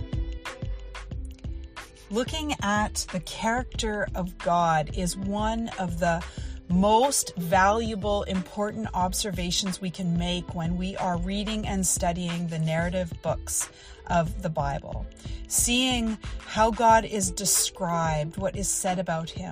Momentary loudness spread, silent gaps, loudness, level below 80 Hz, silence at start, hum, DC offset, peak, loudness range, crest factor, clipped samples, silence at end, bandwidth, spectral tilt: 15 LU; none; -26 LUFS; -38 dBFS; 0 s; none; under 0.1%; -8 dBFS; 5 LU; 20 dB; under 0.1%; 0 s; 15.5 kHz; -4 dB/octave